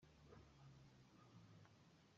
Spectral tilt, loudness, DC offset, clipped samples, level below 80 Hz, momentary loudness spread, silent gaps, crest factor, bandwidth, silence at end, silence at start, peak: -5.5 dB/octave; -68 LUFS; under 0.1%; under 0.1%; -80 dBFS; 2 LU; none; 16 dB; 7.4 kHz; 0 s; 0 s; -52 dBFS